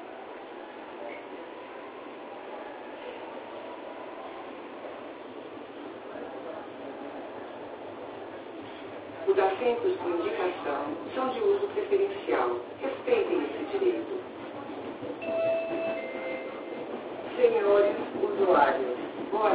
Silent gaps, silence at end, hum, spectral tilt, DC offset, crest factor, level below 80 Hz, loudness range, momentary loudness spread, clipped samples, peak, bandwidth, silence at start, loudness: none; 0 s; none; -3 dB/octave; under 0.1%; 20 dB; -70 dBFS; 14 LU; 17 LU; under 0.1%; -10 dBFS; 4 kHz; 0 s; -31 LUFS